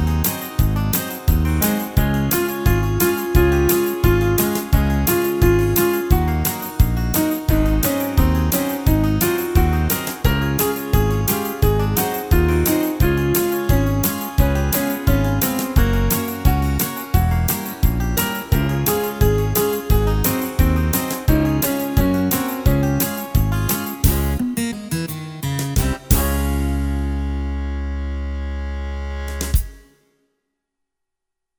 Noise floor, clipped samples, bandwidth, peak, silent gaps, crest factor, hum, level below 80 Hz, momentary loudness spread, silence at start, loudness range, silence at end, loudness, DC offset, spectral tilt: -79 dBFS; under 0.1%; over 20 kHz; 0 dBFS; none; 18 dB; none; -22 dBFS; 7 LU; 0 s; 5 LU; 1.8 s; -19 LUFS; under 0.1%; -5.5 dB/octave